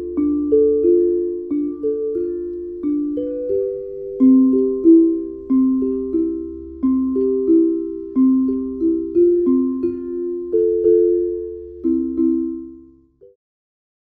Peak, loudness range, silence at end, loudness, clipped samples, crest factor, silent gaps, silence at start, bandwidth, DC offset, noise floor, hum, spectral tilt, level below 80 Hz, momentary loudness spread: -4 dBFS; 4 LU; 1.25 s; -18 LUFS; under 0.1%; 14 dB; none; 0 s; 2.4 kHz; under 0.1%; -48 dBFS; none; -12.5 dB/octave; -48 dBFS; 11 LU